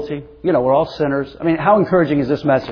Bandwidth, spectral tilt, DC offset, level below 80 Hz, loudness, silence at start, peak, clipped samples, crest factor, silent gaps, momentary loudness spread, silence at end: 5.4 kHz; -9 dB/octave; under 0.1%; -46 dBFS; -17 LUFS; 0 s; -2 dBFS; under 0.1%; 14 dB; none; 6 LU; 0 s